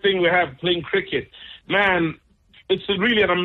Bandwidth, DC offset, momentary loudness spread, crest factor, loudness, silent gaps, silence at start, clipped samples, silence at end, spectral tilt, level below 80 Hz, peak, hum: 4.3 kHz; under 0.1%; 10 LU; 14 dB; -21 LUFS; none; 0.05 s; under 0.1%; 0 s; -7 dB/octave; -52 dBFS; -8 dBFS; none